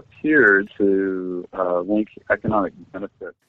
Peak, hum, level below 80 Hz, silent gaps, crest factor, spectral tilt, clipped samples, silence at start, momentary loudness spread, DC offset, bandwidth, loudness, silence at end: -2 dBFS; none; -54 dBFS; none; 18 dB; -9 dB/octave; under 0.1%; 0.25 s; 18 LU; under 0.1%; 4 kHz; -20 LUFS; 0.2 s